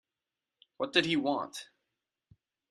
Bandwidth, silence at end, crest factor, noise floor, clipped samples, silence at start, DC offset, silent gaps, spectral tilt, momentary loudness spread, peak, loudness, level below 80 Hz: 13.5 kHz; 1.05 s; 26 dB; under -90 dBFS; under 0.1%; 0.8 s; under 0.1%; none; -4 dB/octave; 14 LU; -10 dBFS; -31 LUFS; -74 dBFS